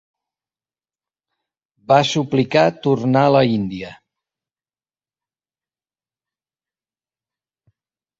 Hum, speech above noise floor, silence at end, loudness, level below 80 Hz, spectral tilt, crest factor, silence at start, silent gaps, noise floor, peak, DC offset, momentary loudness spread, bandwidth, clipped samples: none; over 74 dB; 4.25 s; -17 LUFS; -58 dBFS; -6 dB/octave; 20 dB; 1.9 s; none; under -90 dBFS; -2 dBFS; under 0.1%; 12 LU; 7.8 kHz; under 0.1%